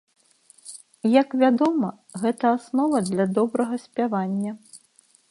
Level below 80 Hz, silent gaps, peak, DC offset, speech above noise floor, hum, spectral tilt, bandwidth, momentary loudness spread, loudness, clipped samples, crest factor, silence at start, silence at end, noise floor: -72 dBFS; none; -4 dBFS; under 0.1%; 38 dB; none; -6.5 dB/octave; 11.5 kHz; 13 LU; -23 LUFS; under 0.1%; 20 dB; 0.65 s; 0.55 s; -60 dBFS